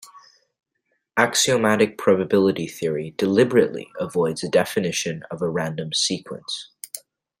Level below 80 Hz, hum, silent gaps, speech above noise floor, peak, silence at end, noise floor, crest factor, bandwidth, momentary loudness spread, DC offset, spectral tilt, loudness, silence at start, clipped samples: -64 dBFS; none; none; 52 dB; -2 dBFS; 0.4 s; -74 dBFS; 20 dB; 16 kHz; 13 LU; under 0.1%; -4 dB/octave; -21 LUFS; 0.15 s; under 0.1%